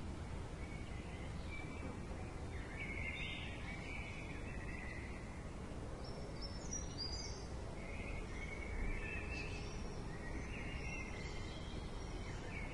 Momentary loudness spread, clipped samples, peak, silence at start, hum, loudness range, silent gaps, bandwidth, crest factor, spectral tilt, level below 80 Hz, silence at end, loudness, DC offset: 5 LU; under 0.1%; -30 dBFS; 0 s; none; 1 LU; none; 11.5 kHz; 14 dB; -4.5 dB/octave; -50 dBFS; 0 s; -47 LUFS; under 0.1%